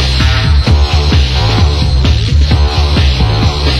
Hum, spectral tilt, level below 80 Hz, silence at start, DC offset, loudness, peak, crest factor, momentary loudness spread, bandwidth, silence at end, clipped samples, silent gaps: none; -5.5 dB/octave; -12 dBFS; 0 s; 0.7%; -10 LUFS; 0 dBFS; 8 dB; 1 LU; 11.5 kHz; 0 s; 0.1%; none